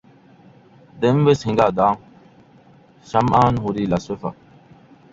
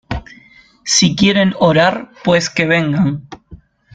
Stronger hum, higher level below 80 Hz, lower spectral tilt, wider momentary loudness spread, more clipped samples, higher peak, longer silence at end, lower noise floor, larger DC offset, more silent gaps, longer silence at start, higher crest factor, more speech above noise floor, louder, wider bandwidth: neither; second, -48 dBFS vs -40 dBFS; first, -7.5 dB/octave vs -4 dB/octave; about the same, 13 LU vs 15 LU; neither; about the same, -2 dBFS vs 0 dBFS; first, 0.8 s vs 0.4 s; first, -50 dBFS vs -46 dBFS; neither; neither; first, 0.95 s vs 0.1 s; about the same, 20 dB vs 16 dB; about the same, 32 dB vs 32 dB; second, -19 LUFS vs -13 LUFS; second, 7.8 kHz vs 9.4 kHz